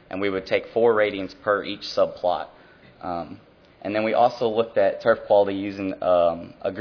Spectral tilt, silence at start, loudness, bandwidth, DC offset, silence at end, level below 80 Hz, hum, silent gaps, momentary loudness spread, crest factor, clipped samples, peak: -6 dB/octave; 0.1 s; -23 LUFS; 5.4 kHz; under 0.1%; 0 s; -60 dBFS; none; none; 12 LU; 16 dB; under 0.1%; -6 dBFS